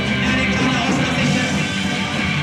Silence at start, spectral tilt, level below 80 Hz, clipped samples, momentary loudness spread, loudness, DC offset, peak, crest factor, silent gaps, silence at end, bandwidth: 0 s; -4.5 dB/octave; -38 dBFS; under 0.1%; 3 LU; -18 LUFS; under 0.1%; -6 dBFS; 12 dB; none; 0 s; 13 kHz